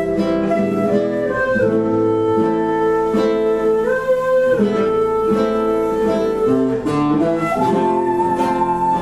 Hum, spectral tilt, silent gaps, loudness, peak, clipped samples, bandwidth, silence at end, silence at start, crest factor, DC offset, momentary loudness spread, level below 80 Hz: none; -7.5 dB/octave; none; -17 LUFS; -4 dBFS; under 0.1%; 13 kHz; 0 s; 0 s; 12 dB; under 0.1%; 2 LU; -44 dBFS